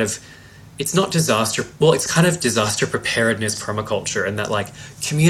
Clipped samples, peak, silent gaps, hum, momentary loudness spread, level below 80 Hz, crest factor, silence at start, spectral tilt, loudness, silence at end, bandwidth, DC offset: under 0.1%; -2 dBFS; none; none; 8 LU; -52 dBFS; 18 dB; 0 s; -4 dB/octave; -19 LUFS; 0 s; 15.5 kHz; under 0.1%